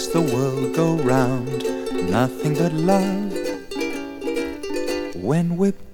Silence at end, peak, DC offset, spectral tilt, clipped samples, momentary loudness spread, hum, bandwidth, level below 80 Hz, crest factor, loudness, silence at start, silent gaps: 0 s; -4 dBFS; under 0.1%; -6.5 dB/octave; under 0.1%; 8 LU; none; 18.5 kHz; -48 dBFS; 18 dB; -22 LUFS; 0 s; none